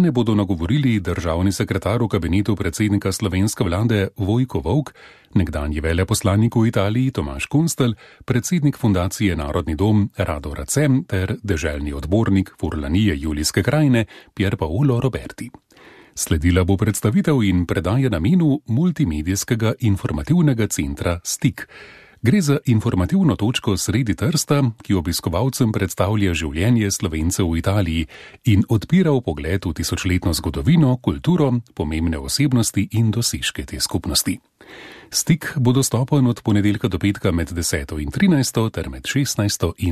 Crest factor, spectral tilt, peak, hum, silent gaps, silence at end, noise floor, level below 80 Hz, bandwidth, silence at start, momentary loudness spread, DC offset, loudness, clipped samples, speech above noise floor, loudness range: 14 dB; -5.5 dB/octave; -4 dBFS; none; none; 0 s; -47 dBFS; -36 dBFS; 14 kHz; 0 s; 6 LU; under 0.1%; -20 LUFS; under 0.1%; 28 dB; 2 LU